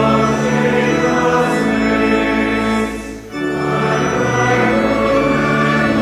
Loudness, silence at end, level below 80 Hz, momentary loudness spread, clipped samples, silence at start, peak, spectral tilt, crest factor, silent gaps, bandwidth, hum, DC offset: -15 LUFS; 0 s; -36 dBFS; 5 LU; under 0.1%; 0 s; 0 dBFS; -5.5 dB/octave; 14 dB; none; 15 kHz; none; under 0.1%